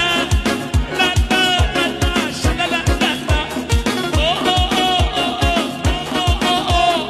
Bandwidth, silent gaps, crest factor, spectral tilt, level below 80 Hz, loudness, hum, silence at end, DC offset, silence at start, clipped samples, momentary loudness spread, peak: 14 kHz; none; 12 dB; -4 dB/octave; -24 dBFS; -17 LUFS; none; 0 s; under 0.1%; 0 s; under 0.1%; 4 LU; -4 dBFS